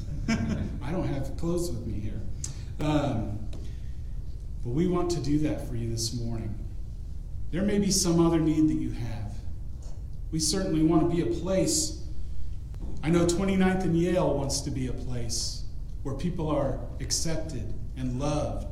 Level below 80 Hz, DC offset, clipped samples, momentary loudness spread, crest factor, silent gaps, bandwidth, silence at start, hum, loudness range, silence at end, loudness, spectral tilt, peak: -36 dBFS; under 0.1%; under 0.1%; 16 LU; 16 dB; none; 16 kHz; 0 s; none; 5 LU; 0 s; -28 LUFS; -5 dB/octave; -12 dBFS